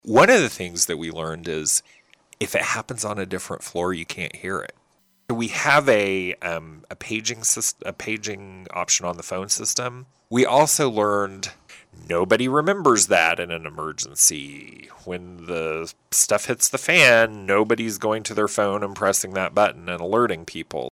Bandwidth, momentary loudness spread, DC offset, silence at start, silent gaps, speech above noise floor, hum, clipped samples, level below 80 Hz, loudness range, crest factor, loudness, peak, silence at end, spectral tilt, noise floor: 19.5 kHz; 15 LU; under 0.1%; 0.05 s; none; 41 dB; none; under 0.1%; -58 dBFS; 7 LU; 20 dB; -21 LUFS; -2 dBFS; 0 s; -2.5 dB/octave; -64 dBFS